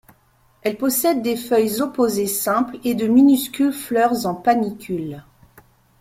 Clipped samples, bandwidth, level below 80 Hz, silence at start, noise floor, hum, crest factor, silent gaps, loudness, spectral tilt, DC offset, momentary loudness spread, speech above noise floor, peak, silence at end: under 0.1%; 16.5 kHz; -58 dBFS; 0.65 s; -58 dBFS; none; 16 dB; none; -19 LUFS; -4.5 dB/octave; under 0.1%; 12 LU; 39 dB; -4 dBFS; 0.8 s